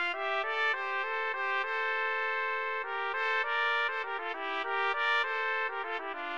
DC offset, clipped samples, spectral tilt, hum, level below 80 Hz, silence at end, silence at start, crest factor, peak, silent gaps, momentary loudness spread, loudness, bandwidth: 0.2%; under 0.1%; -1 dB/octave; none; -74 dBFS; 0 s; 0 s; 16 dB; -16 dBFS; none; 6 LU; -31 LUFS; 9.4 kHz